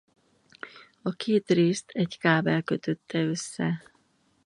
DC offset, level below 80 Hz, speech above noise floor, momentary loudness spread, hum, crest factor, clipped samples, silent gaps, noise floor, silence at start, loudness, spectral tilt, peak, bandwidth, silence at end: under 0.1%; -70 dBFS; 41 dB; 18 LU; none; 22 dB; under 0.1%; none; -67 dBFS; 0.65 s; -27 LUFS; -5.5 dB/octave; -6 dBFS; 11 kHz; 0.65 s